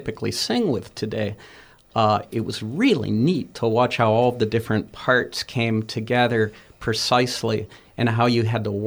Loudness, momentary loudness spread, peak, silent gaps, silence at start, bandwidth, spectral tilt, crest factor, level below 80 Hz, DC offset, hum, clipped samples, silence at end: -22 LUFS; 9 LU; -4 dBFS; none; 0 s; over 20 kHz; -5.5 dB/octave; 18 dB; -54 dBFS; under 0.1%; none; under 0.1%; 0 s